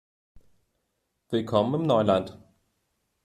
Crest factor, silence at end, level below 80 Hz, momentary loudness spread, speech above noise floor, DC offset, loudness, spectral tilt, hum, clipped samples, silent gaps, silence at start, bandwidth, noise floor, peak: 22 dB; 0.9 s; -64 dBFS; 9 LU; 54 dB; under 0.1%; -25 LUFS; -7.5 dB/octave; none; under 0.1%; none; 0.35 s; 12.5 kHz; -78 dBFS; -8 dBFS